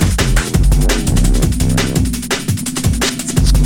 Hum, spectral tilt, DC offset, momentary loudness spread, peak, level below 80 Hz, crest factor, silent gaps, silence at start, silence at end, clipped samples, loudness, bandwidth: none; -4.5 dB/octave; under 0.1%; 3 LU; 0 dBFS; -16 dBFS; 12 dB; none; 0 s; 0 s; under 0.1%; -15 LUFS; 17 kHz